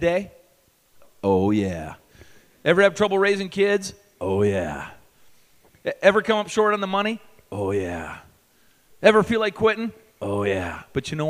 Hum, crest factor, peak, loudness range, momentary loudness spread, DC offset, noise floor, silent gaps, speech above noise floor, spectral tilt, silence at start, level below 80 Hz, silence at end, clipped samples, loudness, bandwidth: none; 24 dB; 0 dBFS; 2 LU; 17 LU; under 0.1%; -61 dBFS; none; 39 dB; -5.5 dB/octave; 0 s; -52 dBFS; 0 s; under 0.1%; -22 LUFS; 15.5 kHz